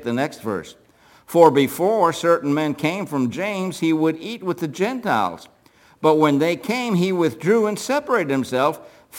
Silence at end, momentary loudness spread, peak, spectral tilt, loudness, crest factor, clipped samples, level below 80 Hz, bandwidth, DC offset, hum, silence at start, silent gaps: 0 s; 10 LU; 0 dBFS; -5.5 dB/octave; -20 LUFS; 20 dB; under 0.1%; -66 dBFS; 17 kHz; under 0.1%; none; 0 s; none